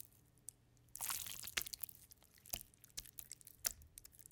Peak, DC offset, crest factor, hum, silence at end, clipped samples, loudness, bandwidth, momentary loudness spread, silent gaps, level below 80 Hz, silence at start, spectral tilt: -18 dBFS; under 0.1%; 34 dB; none; 0 s; under 0.1%; -46 LUFS; 19 kHz; 16 LU; none; -70 dBFS; 0 s; 0.5 dB/octave